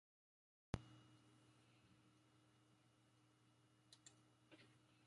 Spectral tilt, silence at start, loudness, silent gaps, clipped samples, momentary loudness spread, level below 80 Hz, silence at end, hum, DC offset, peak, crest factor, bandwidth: -5.5 dB/octave; 0.75 s; -58 LUFS; none; under 0.1%; 15 LU; -72 dBFS; 0 s; none; under 0.1%; -28 dBFS; 36 dB; 11 kHz